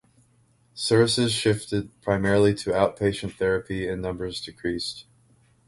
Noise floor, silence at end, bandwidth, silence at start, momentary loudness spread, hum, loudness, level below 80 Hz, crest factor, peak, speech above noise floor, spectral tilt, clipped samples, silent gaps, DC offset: -62 dBFS; 0.65 s; 11.5 kHz; 0.75 s; 11 LU; none; -24 LUFS; -48 dBFS; 20 dB; -6 dBFS; 38 dB; -5 dB/octave; under 0.1%; none; under 0.1%